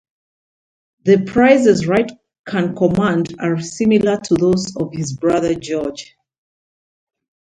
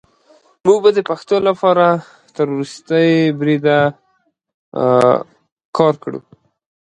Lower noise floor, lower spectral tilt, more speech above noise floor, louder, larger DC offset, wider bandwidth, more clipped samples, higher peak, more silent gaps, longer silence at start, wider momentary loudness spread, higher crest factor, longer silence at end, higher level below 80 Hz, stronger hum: first, under -90 dBFS vs -63 dBFS; about the same, -6 dB/octave vs -6.5 dB/octave; first, over 74 dB vs 49 dB; about the same, -16 LUFS vs -15 LUFS; neither; about the same, 10.5 kHz vs 11 kHz; neither; about the same, 0 dBFS vs 0 dBFS; second, 2.39-2.44 s vs 4.54-4.72 s, 5.52-5.56 s, 5.65-5.73 s; first, 1.05 s vs 0.65 s; about the same, 11 LU vs 12 LU; about the same, 18 dB vs 16 dB; first, 1.35 s vs 0.65 s; first, -50 dBFS vs -62 dBFS; neither